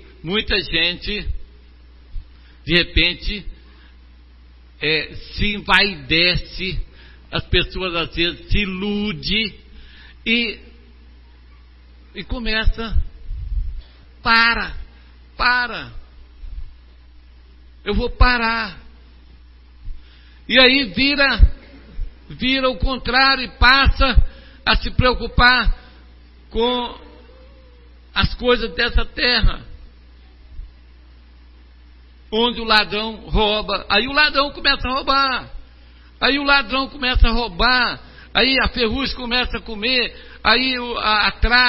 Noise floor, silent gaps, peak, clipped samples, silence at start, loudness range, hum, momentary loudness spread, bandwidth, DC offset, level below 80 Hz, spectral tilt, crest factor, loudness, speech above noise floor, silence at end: -45 dBFS; none; 0 dBFS; under 0.1%; 0.05 s; 8 LU; none; 16 LU; 5.8 kHz; under 0.1%; -26 dBFS; -6.5 dB/octave; 20 dB; -18 LUFS; 27 dB; 0 s